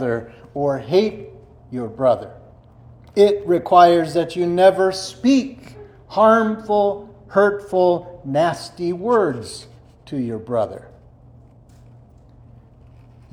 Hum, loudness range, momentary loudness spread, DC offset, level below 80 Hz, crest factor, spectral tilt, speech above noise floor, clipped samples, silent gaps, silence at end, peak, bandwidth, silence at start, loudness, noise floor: none; 12 LU; 17 LU; under 0.1%; -54 dBFS; 20 dB; -6 dB/octave; 29 dB; under 0.1%; none; 2.55 s; 0 dBFS; 13.5 kHz; 0 s; -18 LUFS; -47 dBFS